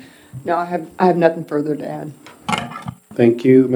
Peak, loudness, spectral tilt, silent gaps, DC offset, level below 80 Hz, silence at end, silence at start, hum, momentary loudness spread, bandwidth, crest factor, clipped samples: 0 dBFS; -18 LUFS; -7 dB/octave; none; under 0.1%; -58 dBFS; 0 s; 0.35 s; none; 17 LU; 19 kHz; 18 dB; under 0.1%